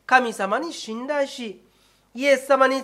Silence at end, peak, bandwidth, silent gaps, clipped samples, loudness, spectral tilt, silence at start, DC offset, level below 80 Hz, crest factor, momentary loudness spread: 0 s; -2 dBFS; 14.5 kHz; none; under 0.1%; -22 LUFS; -3 dB/octave; 0.1 s; under 0.1%; -70 dBFS; 20 dB; 16 LU